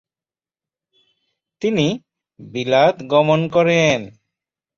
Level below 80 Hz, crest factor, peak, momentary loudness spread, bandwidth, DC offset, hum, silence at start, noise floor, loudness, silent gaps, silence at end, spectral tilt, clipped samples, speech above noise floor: -56 dBFS; 18 dB; -2 dBFS; 14 LU; 7.4 kHz; under 0.1%; none; 1.6 s; under -90 dBFS; -17 LUFS; none; 0.7 s; -5.5 dB/octave; under 0.1%; over 74 dB